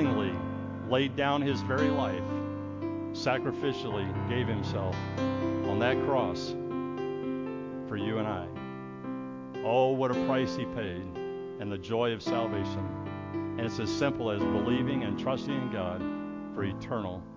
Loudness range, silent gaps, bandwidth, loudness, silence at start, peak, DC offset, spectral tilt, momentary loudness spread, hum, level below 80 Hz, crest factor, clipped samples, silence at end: 3 LU; none; 7.6 kHz; -32 LUFS; 0 s; -14 dBFS; under 0.1%; -7 dB/octave; 10 LU; none; -52 dBFS; 18 dB; under 0.1%; 0 s